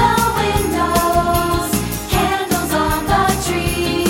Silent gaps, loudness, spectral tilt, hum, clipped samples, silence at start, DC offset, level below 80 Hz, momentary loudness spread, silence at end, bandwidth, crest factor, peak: none; -17 LUFS; -4.5 dB/octave; none; under 0.1%; 0 s; under 0.1%; -28 dBFS; 3 LU; 0 s; 17 kHz; 14 dB; -2 dBFS